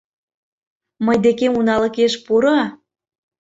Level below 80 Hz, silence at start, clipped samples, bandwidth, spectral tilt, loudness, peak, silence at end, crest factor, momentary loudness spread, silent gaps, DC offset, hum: -56 dBFS; 1 s; under 0.1%; 8 kHz; -5 dB/octave; -17 LUFS; -4 dBFS; 0.65 s; 16 dB; 4 LU; none; under 0.1%; none